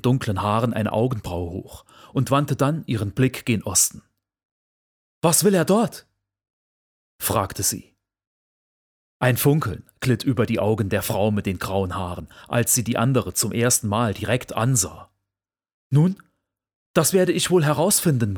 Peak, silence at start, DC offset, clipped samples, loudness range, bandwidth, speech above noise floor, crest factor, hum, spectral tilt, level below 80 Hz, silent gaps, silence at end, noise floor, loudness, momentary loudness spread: -4 dBFS; 0.05 s; under 0.1%; under 0.1%; 3 LU; over 20 kHz; 67 dB; 20 dB; none; -4.5 dB/octave; -52 dBFS; 4.45-5.21 s, 6.50-7.19 s, 8.27-9.20 s, 15.74-15.90 s, 16.75-16.94 s; 0 s; -88 dBFS; -21 LUFS; 9 LU